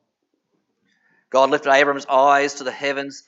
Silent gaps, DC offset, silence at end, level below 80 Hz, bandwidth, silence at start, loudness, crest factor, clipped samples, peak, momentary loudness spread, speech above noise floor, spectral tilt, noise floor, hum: none; under 0.1%; 0.1 s; -86 dBFS; 8 kHz; 1.35 s; -18 LUFS; 18 dB; under 0.1%; -2 dBFS; 9 LU; 55 dB; -3 dB/octave; -73 dBFS; none